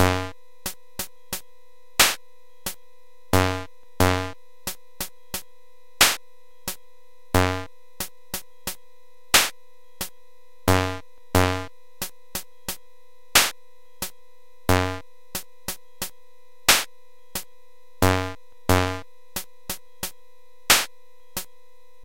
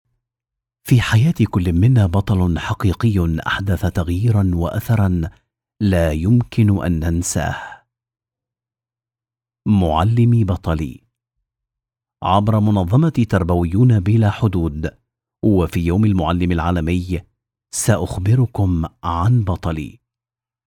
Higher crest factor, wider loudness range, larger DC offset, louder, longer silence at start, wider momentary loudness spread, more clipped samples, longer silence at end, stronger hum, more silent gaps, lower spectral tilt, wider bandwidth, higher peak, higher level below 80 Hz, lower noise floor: first, 26 dB vs 16 dB; about the same, 3 LU vs 3 LU; first, 1% vs under 0.1%; second, -25 LUFS vs -18 LUFS; second, 0 s vs 0.85 s; first, 16 LU vs 9 LU; neither; second, 0.6 s vs 0.75 s; neither; neither; second, -3 dB/octave vs -7 dB/octave; about the same, 17 kHz vs 16.5 kHz; about the same, -2 dBFS vs 0 dBFS; second, -46 dBFS vs -38 dBFS; second, -59 dBFS vs under -90 dBFS